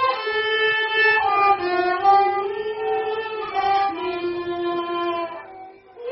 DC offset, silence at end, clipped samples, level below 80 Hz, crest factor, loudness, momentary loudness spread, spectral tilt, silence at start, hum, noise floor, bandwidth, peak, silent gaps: under 0.1%; 0 s; under 0.1%; -60 dBFS; 16 dB; -21 LUFS; 10 LU; 0 dB/octave; 0 s; none; -42 dBFS; 5.8 kHz; -6 dBFS; none